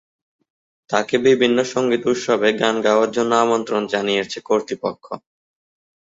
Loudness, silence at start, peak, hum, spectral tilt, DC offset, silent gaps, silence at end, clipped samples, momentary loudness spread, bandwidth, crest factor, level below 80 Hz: -19 LUFS; 0.9 s; -2 dBFS; none; -4 dB/octave; under 0.1%; none; 0.95 s; under 0.1%; 10 LU; 7.8 kHz; 18 dB; -64 dBFS